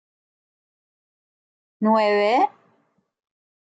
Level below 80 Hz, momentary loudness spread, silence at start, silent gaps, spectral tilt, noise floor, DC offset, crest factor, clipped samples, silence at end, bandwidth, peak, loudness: -84 dBFS; 7 LU; 1.8 s; none; -6 dB/octave; -66 dBFS; under 0.1%; 18 dB; under 0.1%; 1.25 s; 8.8 kHz; -6 dBFS; -20 LUFS